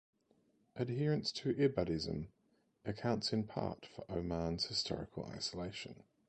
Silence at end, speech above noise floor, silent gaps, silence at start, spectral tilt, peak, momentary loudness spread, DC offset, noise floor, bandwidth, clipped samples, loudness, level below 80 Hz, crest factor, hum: 0.35 s; 36 dB; none; 0.75 s; -5.5 dB/octave; -20 dBFS; 13 LU; under 0.1%; -75 dBFS; 9 kHz; under 0.1%; -39 LUFS; -60 dBFS; 20 dB; none